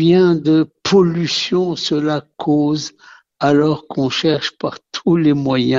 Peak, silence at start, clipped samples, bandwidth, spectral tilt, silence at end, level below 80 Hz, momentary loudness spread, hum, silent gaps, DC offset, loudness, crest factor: -2 dBFS; 0 s; under 0.1%; 7.8 kHz; -6 dB/octave; 0 s; -54 dBFS; 9 LU; none; none; under 0.1%; -16 LUFS; 14 dB